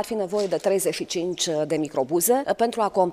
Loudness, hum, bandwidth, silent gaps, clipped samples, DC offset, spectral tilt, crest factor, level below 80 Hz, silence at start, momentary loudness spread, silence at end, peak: -24 LUFS; none; 15.5 kHz; none; under 0.1%; under 0.1%; -3.5 dB/octave; 16 dB; -64 dBFS; 0 s; 5 LU; 0 s; -8 dBFS